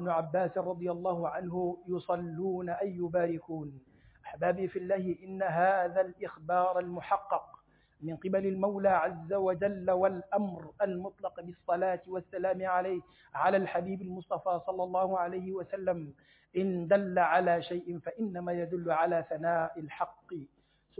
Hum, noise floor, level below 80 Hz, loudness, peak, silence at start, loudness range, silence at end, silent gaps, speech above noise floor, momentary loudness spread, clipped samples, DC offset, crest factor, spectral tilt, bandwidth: none; -60 dBFS; -68 dBFS; -32 LUFS; -14 dBFS; 0 s; 3 LU; 0.55 s; none; 28 dB; 11 LU; under 0.1%; under 0.1%; 18 dB; -6 dB/octave; 4 kHz